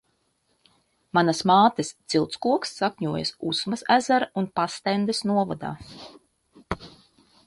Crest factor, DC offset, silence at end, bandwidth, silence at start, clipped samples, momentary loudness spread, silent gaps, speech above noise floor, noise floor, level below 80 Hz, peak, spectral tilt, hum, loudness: 20 dB; under 0.1%; 0.6 s; 11.5 kHz; 1.15 s; under 0.1%; 16 LU; none; 47 dB; -70 dBFS; -56 dBFS; -6 dBFS; -4.5 dB/octave; none; -24 LUFS